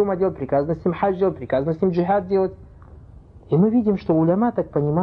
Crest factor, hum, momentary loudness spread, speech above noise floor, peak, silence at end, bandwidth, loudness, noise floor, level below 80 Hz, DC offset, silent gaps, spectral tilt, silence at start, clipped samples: 14 dB; none; 5 LU; 24 dB; -6 dBFS; 0 s; 5.6 kHz; -21 LUFS; -44 dBFS; -48 dBFS; under 0.1%; none; -11 dB/octave; 0 s; under 0.1%